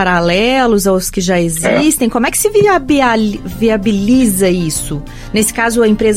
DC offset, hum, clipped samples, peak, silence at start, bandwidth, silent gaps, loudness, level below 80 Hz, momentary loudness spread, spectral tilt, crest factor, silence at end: under 0.1%; none; under 0.1%; 0 dBFS; 0 s; 16.5 kHz; none; -12 LUFS; -30 dBFS; 6 LU; -4.5 dB/octave; 12 dB; 0 s